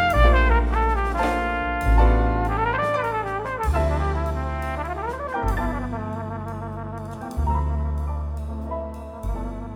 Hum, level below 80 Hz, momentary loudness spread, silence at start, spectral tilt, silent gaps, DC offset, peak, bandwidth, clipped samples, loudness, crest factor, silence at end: none; -24 dBFS; 13 LU; 0 s; -7 dB/octave; none; under 0.1%; -4 dBFS; 12.5 kHz; under 0.1%; -24 LUFS; 18 dB; 0 s